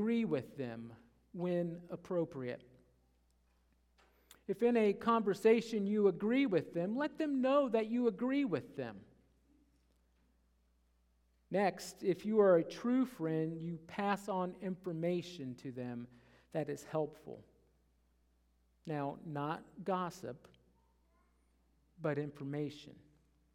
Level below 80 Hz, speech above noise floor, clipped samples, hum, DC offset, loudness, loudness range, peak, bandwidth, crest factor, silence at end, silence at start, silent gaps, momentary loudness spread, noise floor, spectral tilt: -74 dBFS; 38 dB; under 0.1%; none; under 0.1%; -36 LUFS; 11 LU; -18 dBFS; 16.5 kHz; 20 dB; 0.65 s; 0 s; none; 16 LU; -74 dBFS; -7 dB/octave